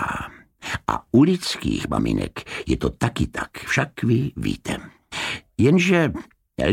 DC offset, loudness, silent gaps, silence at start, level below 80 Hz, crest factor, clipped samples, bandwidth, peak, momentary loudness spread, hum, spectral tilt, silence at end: under 0.1%; -22 LUFS; none; 0 s; -40 dBFS; 20 dB; under 0.1%; 16.5 kHz; -2 dBFS; 14 LU; none; -6 dB/octave; 0 s